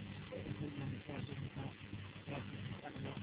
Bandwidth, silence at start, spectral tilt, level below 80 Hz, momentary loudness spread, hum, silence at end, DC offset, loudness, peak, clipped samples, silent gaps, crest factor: 4 kHz; 0 s; -5.5 dB/octave; -62 dBFS; 4 LU; none; 0 s; under 0.1%; -47 LUFS; -32 dBFS; under 0.1%; none; 14 dB